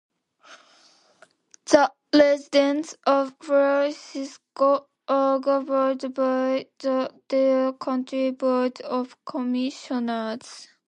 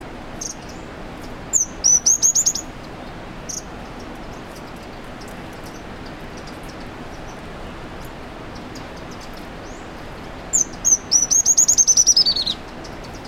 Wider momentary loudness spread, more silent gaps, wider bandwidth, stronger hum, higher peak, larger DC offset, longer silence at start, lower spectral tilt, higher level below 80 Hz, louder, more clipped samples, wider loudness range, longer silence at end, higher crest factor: second, 11 LU vs 23 LU; neither; second, 10 kHz vs over 20 kHz; neither; about the same, -2 dBFS vs -2 dBFS; neither; first, 0.5 s vs 0 s; first, -3.5 dB/octave vs -0.5 dB/octave; second, -72 dBFS vs -40 dBFS; second, -23 LUFS vs -14 LUFS; neither; second, 3 LU vs 20 LU; first, 0.25 s vs 0 s; about the same, 22 dB vs 20 dB